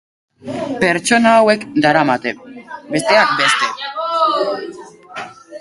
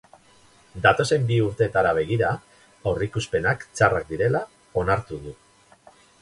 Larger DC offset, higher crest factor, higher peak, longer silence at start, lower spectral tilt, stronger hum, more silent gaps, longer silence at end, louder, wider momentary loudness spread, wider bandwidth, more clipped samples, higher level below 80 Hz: neither; about the same, 16 dB vs 20 dB; first, 0 dBFS vs -4 dBFS; second, 0.45 s vs 0.75 s; second, -3.5 dB/octave vs -5.5 dB/octave; neither; neither; second, 0 s vs 0.9 s; first, -15 LUFS vs -23 LUFS; first, 21 LU vs 11 LU; about the same, 12 kHz vs 11.5 kHz; neither; second, -58 dBFS vs -46 dBFS